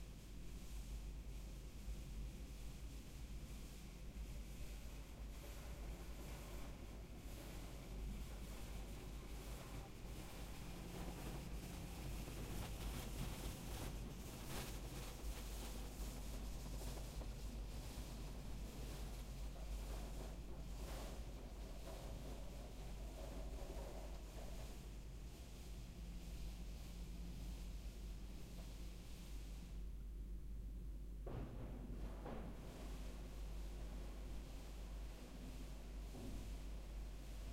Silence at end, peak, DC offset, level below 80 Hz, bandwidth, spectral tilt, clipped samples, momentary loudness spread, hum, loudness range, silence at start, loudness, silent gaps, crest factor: 0 s; -34 dBFS; under 0.1%; -52 dBFS; 16 kHz; -5 dB/octave; under 0.1%; 5 LU; none; 4 LU; 0 s; -53 LUFS; none; 16 dB